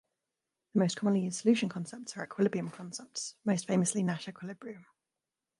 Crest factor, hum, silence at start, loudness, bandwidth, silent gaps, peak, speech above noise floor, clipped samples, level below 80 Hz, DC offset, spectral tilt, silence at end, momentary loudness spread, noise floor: 18 dB; none; 0.75 s; -32 LUFS; 11.5 kHz; none; -14 dBFS; 58 dB; under 0.1%; -80 dBFS; under 0.1%; -5 dB/octave; 0.8 s; 15 LU; -90 dBFS